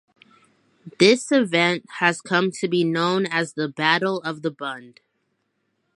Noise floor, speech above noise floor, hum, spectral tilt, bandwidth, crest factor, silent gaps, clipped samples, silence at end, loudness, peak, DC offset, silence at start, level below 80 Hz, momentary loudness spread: -73 dBFS; 51 dB; none; -4.5 dB/octave; 11.5 kHz; 22 dB; none; under 0.1%; 1.05 s; -21 LUFS; -2 dBFS; under 0.1%; 0.85 s; -74 dBFS; 11 LU